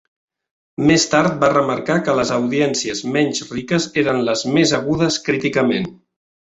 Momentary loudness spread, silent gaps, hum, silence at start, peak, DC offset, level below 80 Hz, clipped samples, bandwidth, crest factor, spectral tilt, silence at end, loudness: 6 LU; none; none; 0.8 s; -2 dBFS; under 0.1%; -52 dBFS; under 0.1%; 8.2 kHz; 16 dB; -4.5 dB/octave; 0.55 s; -17 LUFS